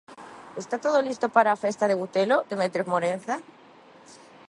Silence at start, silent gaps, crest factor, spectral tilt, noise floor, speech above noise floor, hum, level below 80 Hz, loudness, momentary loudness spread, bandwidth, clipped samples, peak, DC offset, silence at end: 0.1 s; none; 20 dB; -5 dB/octave; -51 dBFS; 27 dB; none; -78 dBFS; -25 LUFS; 16 LU; 11.5 kHz; under 0.1%; -6 dBFS; under 0.1%; 0.35 s